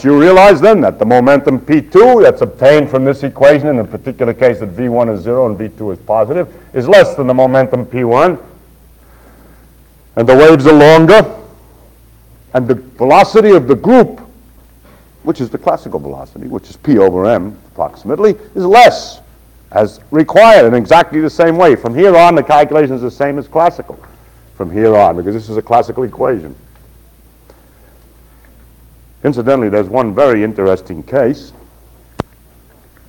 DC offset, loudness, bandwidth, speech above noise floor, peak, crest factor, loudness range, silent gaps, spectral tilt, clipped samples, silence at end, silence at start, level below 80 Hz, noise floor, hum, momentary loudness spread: under 0.1%; -9 LUFS; 18 kHz; 35 dB; 0 dBFS; 10 dB; 8 LU; none; -6.5 dB/octave; 4%; 0.85 s; 0 s; -42 dBFS; -44 dBFS; none; 16 LU